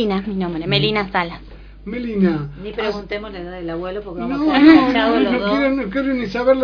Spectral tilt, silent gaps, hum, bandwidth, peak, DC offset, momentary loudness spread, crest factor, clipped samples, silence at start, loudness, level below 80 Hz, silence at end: -7.5 dB/octave; none; 50 Hz at -40 dBFS; 5.4 kHz; 0 dBFS; under 0.1%; 15 LU; 18 dB; under 0.1%; 0 s; -18 LUFS; -40 dBFS; 0 s